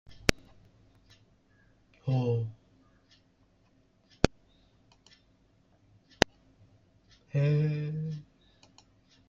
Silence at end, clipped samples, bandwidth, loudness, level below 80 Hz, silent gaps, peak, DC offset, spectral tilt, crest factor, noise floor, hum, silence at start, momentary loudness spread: 1.05 s; under 0.1%; 15.5 kHz; -31 LUFS; -52 dBFS; none; -2 dBFS; under 0.1%; -5.5 dB/octave; 34 dB; -67 dBFS; none; 0.1 s; 12 LU